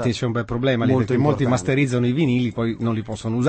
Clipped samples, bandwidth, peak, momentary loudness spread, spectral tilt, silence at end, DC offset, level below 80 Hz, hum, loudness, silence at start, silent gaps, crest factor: under 0.1%; 8.8 kHz; -6 dBFS; 6 LU; -7 dB/octave; 0 s; under 0.1%; -48 dBFS; none; -21 LUFS; 0 s; none; 14 dB